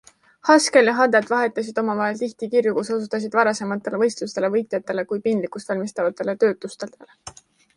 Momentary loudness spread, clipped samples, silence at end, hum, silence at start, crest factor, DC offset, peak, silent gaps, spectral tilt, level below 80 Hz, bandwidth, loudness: 14 LU; under 0.1%; 0.45 s; none; 0.45 s; 20 dB; under 0.1%; -2 dBFS; none; -4 dB/octave; -68 dBFS; 11.5 kHz; -21 LUFS